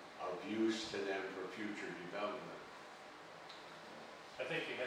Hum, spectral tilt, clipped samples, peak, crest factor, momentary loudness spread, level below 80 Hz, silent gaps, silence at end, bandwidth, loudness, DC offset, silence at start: none; -4 dB/octave; under 0.1%; -28 dBFS; 16 dB; 15 LU; -82 dBFS; none; 0 s; 14.5 kHz; -44 LUFS; under 0.1%; 0 s